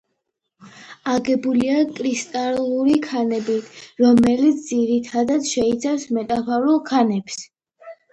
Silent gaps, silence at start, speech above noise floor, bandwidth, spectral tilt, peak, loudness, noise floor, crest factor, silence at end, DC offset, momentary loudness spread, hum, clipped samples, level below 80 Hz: none; 0.6 s; 57 dB; 10 kHz; -5 dB/octave; -4 dBFS; -20 LUFS; -76 dBFS; 16 dB; 0.2 s; under 0.1%; 8 LU; none; under 0.1%; -56 dBFS